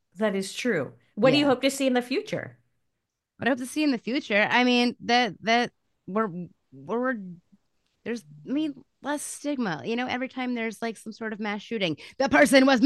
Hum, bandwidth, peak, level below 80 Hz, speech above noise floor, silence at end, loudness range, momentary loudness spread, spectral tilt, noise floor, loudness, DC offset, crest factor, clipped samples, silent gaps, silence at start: none; 12.5 kHz; -6 dBFS; -68 dBFS; 56 dB; 0 s; 8 LU; 15 LU; -4 dB/octave; -81 dBFS; -26 LUFS; under 0.1%; 20 dB; under 0.1%; none; 0.15 s